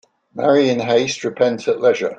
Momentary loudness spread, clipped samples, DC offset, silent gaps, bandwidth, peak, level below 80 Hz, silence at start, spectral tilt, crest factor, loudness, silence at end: 6 LU; under 0.1%; under 0.1%; none; 8.8 kHz; -2 dBFS; -64 dBFS; 0.35 s; -4.5 dB/octave; 16 dB; -17 LUFS; 0.05 s